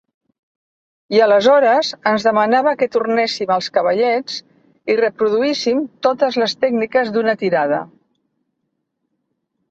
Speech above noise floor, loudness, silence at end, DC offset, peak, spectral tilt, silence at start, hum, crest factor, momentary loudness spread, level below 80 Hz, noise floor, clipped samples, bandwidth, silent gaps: 57 dB; -16 LUFS; 1.85 s; under 0.1%; -2 dBFS; -4.5 dB/octave; 1.1 s; none; 16 dB; 7 LU; -66 dBFS; -73 dBFS; under 0.1%; 8 kHz; none